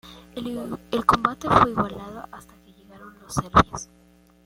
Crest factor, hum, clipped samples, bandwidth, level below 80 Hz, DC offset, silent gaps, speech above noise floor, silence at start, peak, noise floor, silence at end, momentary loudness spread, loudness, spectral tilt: 22 dB; 60 Hz at -50 dBFS; under 0.1%; 16.5 kHz; -44 dBFS; under 0.1%; none; 33 dB; 0.05 s; -2 dBFS; -56 dBFS; 0.6 s; 20 LU; -22 LUFS; -5.5 dB/octave